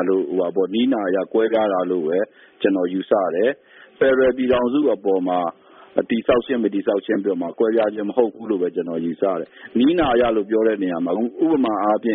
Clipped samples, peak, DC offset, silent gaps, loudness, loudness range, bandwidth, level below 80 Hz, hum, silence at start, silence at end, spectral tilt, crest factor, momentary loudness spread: under 0.1%; -2 dBFS; under 0.1%; none; -20 LUFS; 1 LU; 4 kHz; -52 dBFS; none; 0 s; 0 s; -4.5 dB/octave; 18 dB; 6 LU